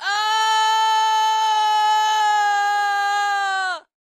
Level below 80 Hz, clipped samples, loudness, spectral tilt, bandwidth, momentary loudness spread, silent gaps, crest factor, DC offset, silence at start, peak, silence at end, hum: under -90 dBFS; under 0.1%; -18 LUFS; 4.5 dB/octave; 15 kHz; 3 LU; none; 8 dB; under 0.1%; 0 s; -10 dBFS; 0.2 s; none